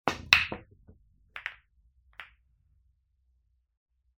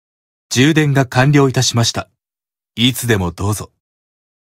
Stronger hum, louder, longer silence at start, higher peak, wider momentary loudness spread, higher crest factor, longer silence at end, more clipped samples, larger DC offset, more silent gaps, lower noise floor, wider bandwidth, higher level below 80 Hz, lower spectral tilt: neither; second, -26 LUFS vs -14 LUFS; second, 0.05 s vs 0.5 s; about the same, -2 dBFS vs 0 dBFS; first, 26 LU vs 10 LU; first, 34 dB vs 16 dB; first, 1.95 s vs 0.8 s; neither; neither; neither; second, -71 dBFS vs under -90 dBFS; about the same, 16 kHz vs 16.5 kHz; second, -58 dBFS vs -46 dBFS; second, -2 dB/octave vs -4.5 dB/octave